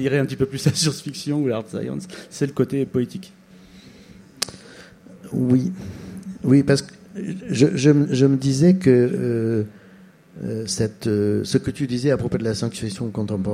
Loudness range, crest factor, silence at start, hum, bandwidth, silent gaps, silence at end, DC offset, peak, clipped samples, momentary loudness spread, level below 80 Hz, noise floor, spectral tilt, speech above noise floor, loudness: 9 LU; 20 dB; 0 s; none; 15.5 kHz; none; 0 s; under 0.1%; 0 dBFS; under 0.1%; 15 LU; -52 dBFS; -48 dBFS; -6 dB/octave; 28 dB; -21 LUFS